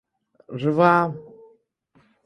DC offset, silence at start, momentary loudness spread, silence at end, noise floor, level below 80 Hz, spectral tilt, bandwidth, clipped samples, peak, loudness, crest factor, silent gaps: under 0.1%; 0.5 s; 20 LU; 1.05 s; -62 dBFS; -66 dBFS; -8.5 dB/octave; 10.5 kHz; under 0.1%; -2 dBFS; -20 LUFS; 22 dB; none